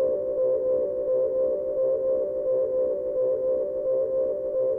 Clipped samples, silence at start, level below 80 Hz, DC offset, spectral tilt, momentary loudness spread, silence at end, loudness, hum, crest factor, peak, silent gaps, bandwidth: under 0.1%; 0 s; -60 dBFS; under 0.1%; -10.5 dB/octave; 2 LU; 0 s; -25 LUFS; none; 8 dB; -16 dBFS; none; 2 kHz